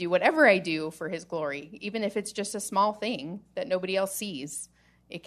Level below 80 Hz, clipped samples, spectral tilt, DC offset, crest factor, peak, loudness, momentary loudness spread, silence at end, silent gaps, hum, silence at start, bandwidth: -70 dBFS; under 0.1%; -3.5 dB/octave; under 0.1%; 22 dB; -6 dBFS; -28 LUFS; 16 LU; 0.05 s; none; none; 0 s; 13.5 kHz